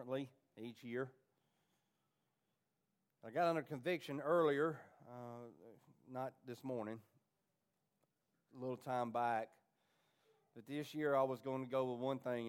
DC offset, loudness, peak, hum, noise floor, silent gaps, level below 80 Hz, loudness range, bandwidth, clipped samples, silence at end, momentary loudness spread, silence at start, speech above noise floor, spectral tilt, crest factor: under 0.1%; -41 LUFS; -24 dBFS; none; -87 dBFS; none; under -90 dBFS; 11 LU; 16 kHz; under 0.1%; 0 s; 17 LU; 0 s; 45 dB; -6.5 dB/octave; 20 dB